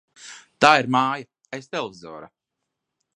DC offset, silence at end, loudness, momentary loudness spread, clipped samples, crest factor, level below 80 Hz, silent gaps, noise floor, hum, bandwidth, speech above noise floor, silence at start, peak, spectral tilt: under 0.1%; 0.9 s; -20 LUFS; 25 LU; under 0.1%; 24 dB; -66 dBFS; none; -82 dBFS; none; 11 kHz; 61 dB; 0.25 s; 0 dBFS; -4 dB/octave